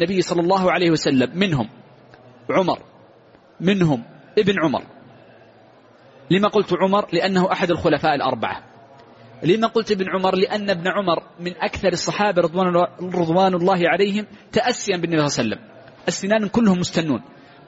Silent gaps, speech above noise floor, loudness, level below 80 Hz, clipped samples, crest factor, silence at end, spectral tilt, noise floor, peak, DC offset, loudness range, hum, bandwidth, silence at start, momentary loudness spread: none; 31 dB; -20 LUFS; -54 dBFS; under 0.1%; 16 dB; 0.4 s; -4.5 dB/octave; -50 dBFS; -4 dBFS; under 0.1%; 3 LU; none; 8 kHz; 0 s; 8 LU